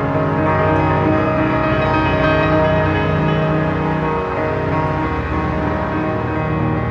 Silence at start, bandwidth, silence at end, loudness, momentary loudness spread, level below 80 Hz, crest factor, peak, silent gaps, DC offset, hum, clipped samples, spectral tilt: 0 s; 7 kHz; 0 s; -17 LUFS; 5 LU; -32 dBFS; 14 dB; -2 dBFS; none; under 0.1%; none; under 0.1%; -8.5 dB/octave